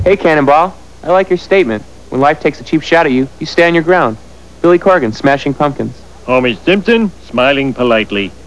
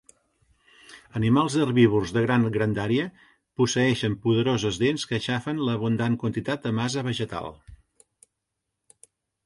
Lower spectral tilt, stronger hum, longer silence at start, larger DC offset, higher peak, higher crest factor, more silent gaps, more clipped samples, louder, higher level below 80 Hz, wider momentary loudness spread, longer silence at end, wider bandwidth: about the same, -6 dB/octave vs -6 dB/octave; neither; second, 0 s vs 0.9 s; first, 2% vs under 0.1%; first, 0 dBFS vs -6 dBFS; second, 12 dB vs 18 dB; neither; first, 0.3% vs under 0.1%; first, -12 LUFS vs -25 LUFS; first, -40 dBFS vs -54 dBFS; about the same, 8 LU vs 9 LU; second, 0.15 s vs 1.7 s; about the same, 11 kHz vs 11.5 kHz